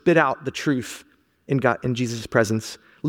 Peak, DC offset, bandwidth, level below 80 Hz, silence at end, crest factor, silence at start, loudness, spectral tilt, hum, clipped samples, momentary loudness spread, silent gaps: -2 dBFS; under 0.1%; 17 kHz; -56 dBFS; 0 s; 20 dB; 0.05 s; -23 LUFS; -5.5 dB/octave; none; under 0.1%; 13 LU; none